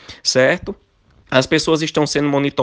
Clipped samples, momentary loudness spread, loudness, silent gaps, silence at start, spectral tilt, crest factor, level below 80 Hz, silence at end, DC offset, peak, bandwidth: under 0.1%; 8 LU; -17 LUFS; none; 0.1 s; -4 dB/octave; 18 dB; -48 dBFS; 0 s; under 0.1%; 0 dBFS; 10 kHz